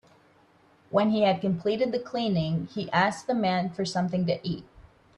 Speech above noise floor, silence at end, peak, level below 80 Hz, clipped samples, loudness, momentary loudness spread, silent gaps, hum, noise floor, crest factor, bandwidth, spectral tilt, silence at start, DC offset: 34 dB; 0.35 s; -8 dBFS; -60 dBFS; under 0.1%; -27 LUFS; 6 LU; none; none; -60 dBFS; 20 dB; 10.5 kHz; -6.5 dB/octave; 0.9 s; under 0.1%